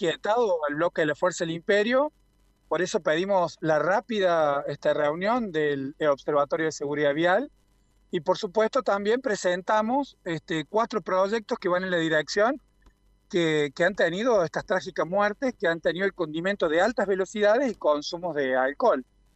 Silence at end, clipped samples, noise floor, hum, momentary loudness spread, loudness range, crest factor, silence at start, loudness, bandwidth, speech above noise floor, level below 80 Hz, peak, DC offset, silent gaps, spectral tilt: 0.35 s; under 0.1%; -63 dBFS; none; 6 LU; 1 LU; 16 dB; 0 s; -25 LUFS; 8.4 kHz; 38 dB; -62 dBFS; -10 dBFS; under 0.1%; none; -5 dB/octave